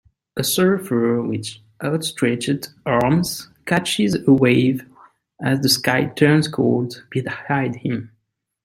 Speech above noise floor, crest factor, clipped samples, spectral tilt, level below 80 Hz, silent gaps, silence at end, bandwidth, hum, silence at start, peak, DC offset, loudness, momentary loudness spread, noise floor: 52 dB; 18 dB; under 0.1%; -5 dB/octave; -54 dBFS; none; 0.6 s; 16.5 kHz; none; 0.35 s; 0 dBFS; under 0.1%; -19 LUFS; 11 LU; -71 dBFS